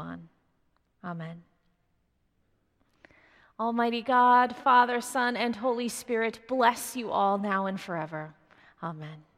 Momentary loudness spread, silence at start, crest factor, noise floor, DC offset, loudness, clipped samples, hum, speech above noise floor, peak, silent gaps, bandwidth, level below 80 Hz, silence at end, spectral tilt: 19 LU; 0 s; 20 dB; -73 dBFS; under 0.1%; -26 LUFS; under 0.1%; none; 45 dB; -8 dBFS; none; 16 kHz; -72 dBFS; 0.15 s; -4 dB/octave